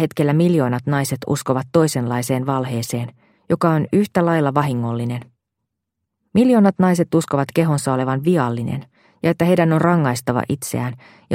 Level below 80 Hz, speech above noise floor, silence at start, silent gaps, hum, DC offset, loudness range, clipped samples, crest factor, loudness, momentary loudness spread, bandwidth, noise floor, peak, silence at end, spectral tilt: -56 dBFS; 61 dB; 0 s; none; none; under 0.1%; 3 LU; under 0.1%; 18 dB; -19 LUFS; 10 LU; 16.5 kHz; -79 dBFS; 0 dBFS; 0 s; -6.5 dB/octave